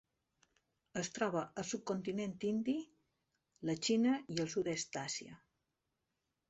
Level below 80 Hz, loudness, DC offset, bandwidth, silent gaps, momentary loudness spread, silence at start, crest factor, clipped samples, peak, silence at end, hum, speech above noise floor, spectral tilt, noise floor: -76 dBFS; -39 LUFS; under 0.1%; 8.2 kHz; none; 11 LU; 0.95 s; 20 dB; under 0.1%; -22 dBFS; 1.15 s; none; 49 dB; -4.5 dB/octave; -87 dBFS